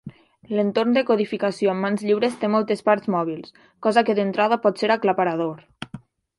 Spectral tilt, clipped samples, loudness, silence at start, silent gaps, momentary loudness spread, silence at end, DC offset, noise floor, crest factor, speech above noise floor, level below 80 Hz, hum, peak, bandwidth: -6.5 dB/octave; under 0.1%; -21 LUFS; 0.05 s; none; 10 LU; 0.4 s; under 0.1%; -43 dBFS; 20 dB; 22 dB; -66 dBFS; none; -2 dBFS; 11.5 kHz